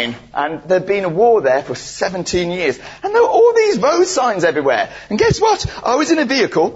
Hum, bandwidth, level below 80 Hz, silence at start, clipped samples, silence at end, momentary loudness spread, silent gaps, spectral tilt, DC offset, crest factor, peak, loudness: none; 8 kHz; -42 dBFS; 0 s; under 0.1%; 0 s; 10 LU; none; -4.5 dB/octave; under 0.1%; 12 dB; -2 dBFS; -15 LUFS